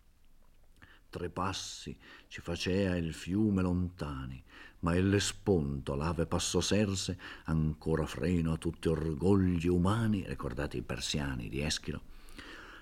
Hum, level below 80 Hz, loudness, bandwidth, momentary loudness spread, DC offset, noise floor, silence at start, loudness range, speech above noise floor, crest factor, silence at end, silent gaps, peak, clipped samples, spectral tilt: none; -50 dBFS; -33 LUFS; 16 kHz; 16 LU; under 0.1%; -59 dBFS; 0.8 s; 3 LU; 27 dB; 18 dB; 0 s; none; -14 dBFS; under 0.1%; -5.5 dB/octave